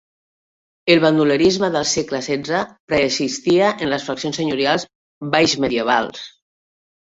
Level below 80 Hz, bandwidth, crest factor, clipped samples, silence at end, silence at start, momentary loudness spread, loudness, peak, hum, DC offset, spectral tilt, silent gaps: -54 dBFS; 8 kHz; 18 dB; under 0.1%; 0.8 s; 0.85 s; 10 LU; -18 LUFS; 0 dBFS; none; under 0.1%; -4 dB/octave; 2.80-2.88 s, 4.95-5.21 s